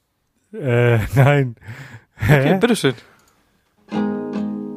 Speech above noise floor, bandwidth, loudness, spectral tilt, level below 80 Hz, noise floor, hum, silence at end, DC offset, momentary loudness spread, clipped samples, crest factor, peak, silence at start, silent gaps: 51 dB; 15.5 kHz; -18 LUFS; -7 dB/octave; -42 dBFS; -67 dBFS; none; 0 s; under 0.1%; 21 LU; under 0.1%; 18 dB; -2 dBFS; 0.55 s; none